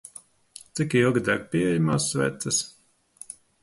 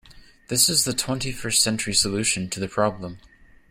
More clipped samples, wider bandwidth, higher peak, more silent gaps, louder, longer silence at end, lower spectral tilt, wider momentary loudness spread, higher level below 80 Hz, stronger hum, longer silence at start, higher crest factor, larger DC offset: neither; second, 12 kHz vs 16 kHz; second, -8 dBFS vs -4 dBFS; neither; second, -24 LUFS vs -21 LUFS; second, 0.3 s vs 0.5 s; first, -4.5 dB/octave vs -2.5 dB/octave; first, 20 LU vs 10 LU; second, -58 dBFS vs -48 dBFS; neither; first, 0.75 s vs 0.1 s; about the same, 18 dB vs 20 dB; neither